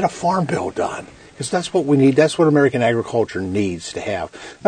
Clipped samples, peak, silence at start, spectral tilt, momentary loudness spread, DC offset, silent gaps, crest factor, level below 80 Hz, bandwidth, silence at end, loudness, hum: under 0.1%; 0 dBFS; 0 s; -6 dB/octave; 12 LU; under 0.1%; none; 18 dB; -54 dBFS; 9.6 kHz; 0 s; -18 LUFS; none